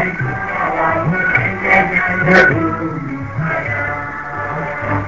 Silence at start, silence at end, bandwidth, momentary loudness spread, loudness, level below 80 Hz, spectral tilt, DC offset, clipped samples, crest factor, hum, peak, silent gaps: 0 s; 0 s; 7.8 kHz; 12 LU; -15 LUFS; -38 dBFS; -7 dB/octave; 0.7%; under 0.1%; 16 dB; none; 0 dBFS; none